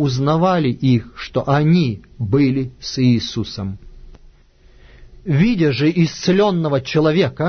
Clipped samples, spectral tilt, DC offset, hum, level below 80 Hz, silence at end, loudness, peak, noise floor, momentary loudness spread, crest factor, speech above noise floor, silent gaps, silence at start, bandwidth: under 0.1%; -7 dB/octave; under 0.1%; none; -42 dBFS; 0 s; -17 LUFS; -2 dBFS; -48 dBFS; 10 LU; 14 dB; 32 dB; none; 0 s; 6.6 kHz